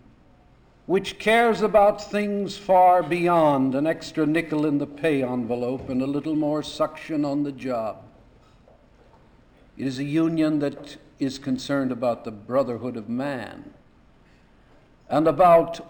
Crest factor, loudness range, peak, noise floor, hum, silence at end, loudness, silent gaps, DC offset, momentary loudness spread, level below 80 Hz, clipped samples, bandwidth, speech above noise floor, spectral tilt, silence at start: 16 dB; 10 LU; -8 dBFS; -55 dBFS; none; 0.05 s; -23 LUFS; none; under 0.1%; 12 LU; -56 dBFS; under 0.1%; 19.5 kHz; 32 dB; -6.5 dB/octave; 0.9 s